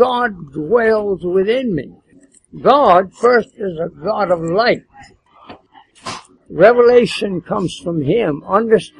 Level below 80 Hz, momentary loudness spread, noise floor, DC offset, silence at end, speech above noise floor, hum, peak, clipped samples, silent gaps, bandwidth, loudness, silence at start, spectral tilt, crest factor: -50 dBFS; 16 LU; -50 dBFS; under 0.1%; 0.15 s; 35 dB; none; 0 dBFS; under 0.1%; none; 11.5 kHz; -15 LUFS; 0 s; -6 dB/octave; 16 dB